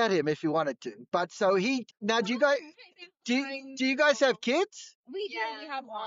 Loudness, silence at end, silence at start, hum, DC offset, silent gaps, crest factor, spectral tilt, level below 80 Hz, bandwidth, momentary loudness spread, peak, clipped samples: -29 LUFS; 0 s; 0 s; none; under 0.1%; 4.95-5.04 s; 16 dB; -2.5 dB/octave; -82 dBFS; 7.8 kHz; 13 LU; -12 dBFS; under 0.1%